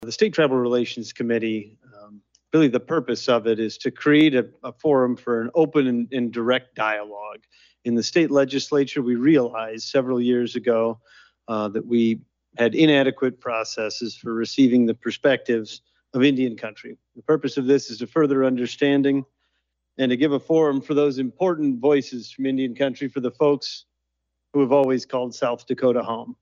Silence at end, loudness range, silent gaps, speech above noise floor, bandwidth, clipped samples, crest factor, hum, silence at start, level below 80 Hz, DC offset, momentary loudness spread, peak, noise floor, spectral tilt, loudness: 0.1 s; 3 LU; none; 57 dB; 7.4 kHz; under 0.1%; 16 dB; none; 0 s; -72 dBFS; under 0.1%; 11 LU; -6 dBFS; -78 dBFS; -5.5 dB/octave; -22 LUFS